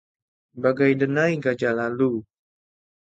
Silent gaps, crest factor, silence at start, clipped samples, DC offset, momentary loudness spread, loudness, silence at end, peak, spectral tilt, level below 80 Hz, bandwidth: none; 18 dB; 0.55 s; under 0.1%; under 0.1%; 5 LU; -22 LUFS; 0.95 s; -6 dBFS; -7.5 dB/octave; -66 dBFS; 7.8 kHz